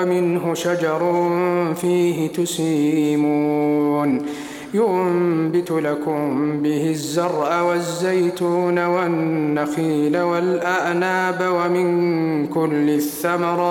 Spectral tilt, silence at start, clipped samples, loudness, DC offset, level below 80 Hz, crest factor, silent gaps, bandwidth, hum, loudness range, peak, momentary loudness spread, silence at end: -6 dB/octave; 0 s; under 0.1%; -20 LUFS; under 0.1%; -64 dBFS; 12 dB; none; 17 kHz; none; 1 LU; -6 dBFS; 3 LU; 0 s